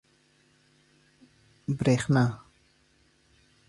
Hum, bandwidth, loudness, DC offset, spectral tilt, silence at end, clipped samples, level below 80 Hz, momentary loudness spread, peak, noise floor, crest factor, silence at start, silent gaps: none; 11.5 kHz; -27 LUFS; under 0.1%; -7 dB/octave; 1.3 s; under 0.1%; -60 dBFS; 17 LU; -10 dBFS; -65 dBFS; 20 dB; 1.7 s; none